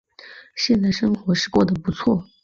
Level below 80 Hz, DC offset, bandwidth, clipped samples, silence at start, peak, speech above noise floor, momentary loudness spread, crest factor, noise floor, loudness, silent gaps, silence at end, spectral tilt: -48 dBFS; under 0.1%; 7.6 kHz; under 0.1%; 0.25 s; -6 dBFS; 25 dB; 4 LU; 16 dB; -45 dBFS; -20 LUFS; none; 0.2 s; -5.5 dB/octave